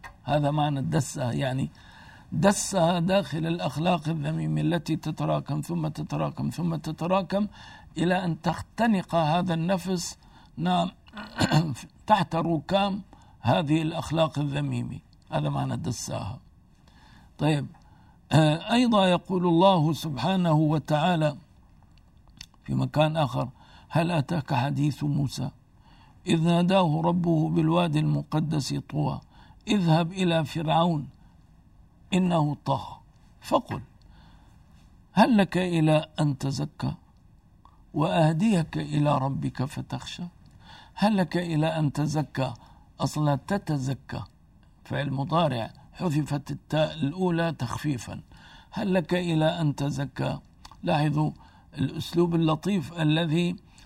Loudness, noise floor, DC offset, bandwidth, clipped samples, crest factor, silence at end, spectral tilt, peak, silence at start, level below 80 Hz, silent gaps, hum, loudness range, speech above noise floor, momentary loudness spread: -26 LUFS; -56 dBFS; under 0.1%; 15 kHz; under 0.1%; 22 dB; 0.3 s; -6.5 dB/octave; -6 dBFS; 0.05 s; -54 dBFS; none; none; 5 LU; 31 dB; 12 LU